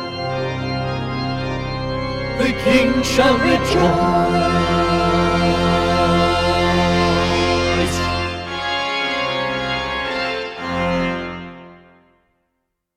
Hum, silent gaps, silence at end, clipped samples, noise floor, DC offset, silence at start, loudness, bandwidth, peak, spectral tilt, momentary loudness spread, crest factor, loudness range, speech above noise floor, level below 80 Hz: none; none; 1.2 s; under 0.1%; -73 dBFS; under 0.1%; 0 s; -18 LUFS; 15 kHz; -2 dBFS; -5.5 dB/octave; 8 LU; 16 dB; 6 LU; 58 dB; -34 dBFS